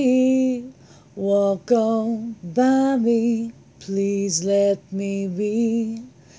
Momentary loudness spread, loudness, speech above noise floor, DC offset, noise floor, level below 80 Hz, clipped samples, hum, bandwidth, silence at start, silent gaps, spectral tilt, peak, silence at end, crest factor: 12 LU; -21 LUFS; 25 dB; under 0.1%; -46 dBFS; -62 dBFS; under 0.1%; none; 8 kHz; 0 s; none; -5.5 dB/octave; -6 dBFS; 0.3 s; 16 dB